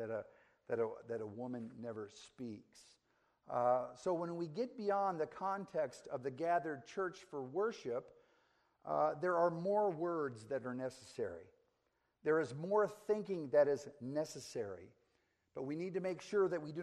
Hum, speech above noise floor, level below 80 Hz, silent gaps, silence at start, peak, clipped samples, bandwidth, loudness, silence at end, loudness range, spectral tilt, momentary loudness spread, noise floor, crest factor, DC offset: none; 43 dB; -82 dBFS; none; 0 s; -22 dBFS; under 0.1%; 13 kHz; -39 LUFS; 0 s; 4 LU; -6.5 dB/octave; 13 LU; -82 dBFS; 18 dB; under 0.1%